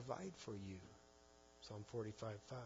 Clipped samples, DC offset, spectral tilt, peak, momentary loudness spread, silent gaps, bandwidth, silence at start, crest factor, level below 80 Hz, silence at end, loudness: under 0.1%; under 0.1%; -6 dB/octave; -32 dBFS; 18 LU; none; 7.4 kHz; 0 s; 20 dB; -76 dBFS; 0 s; -52 LUFS